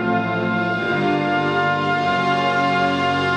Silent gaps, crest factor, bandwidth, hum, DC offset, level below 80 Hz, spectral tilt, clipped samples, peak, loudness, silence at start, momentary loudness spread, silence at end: none; 12 dB; 9.2 kHz; none; under 0.1%; -58 dBFS; -6 dB/octave; under 0.1%; -6 dBFS; -19 LUFS; 0 s; 2 LU; 0 s